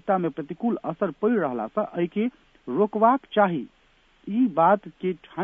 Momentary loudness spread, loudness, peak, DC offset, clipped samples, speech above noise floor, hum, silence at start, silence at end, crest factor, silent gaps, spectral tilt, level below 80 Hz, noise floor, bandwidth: 11 LU; -25 LUFS; -4 dBFS; under 0.1%; under 0.1%; 36 dB; none; 0.05 s; 0 s; 20 dB; none; -9.5 dB/octave; -66 dBFS; -60 dBFS; 3.8 kHz